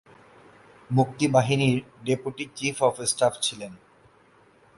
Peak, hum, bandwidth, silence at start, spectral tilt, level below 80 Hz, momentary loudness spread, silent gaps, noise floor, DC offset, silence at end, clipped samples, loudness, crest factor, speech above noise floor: -6 dBFS; none; 11.5 kHz; 0.9 s; -4.5 dB/octave; -62 dBFS; 8 LU; none; -58 dBFS; under 0.1%; 1 s; under 0.1%; -25 LUFS; 22 dB; 33 dB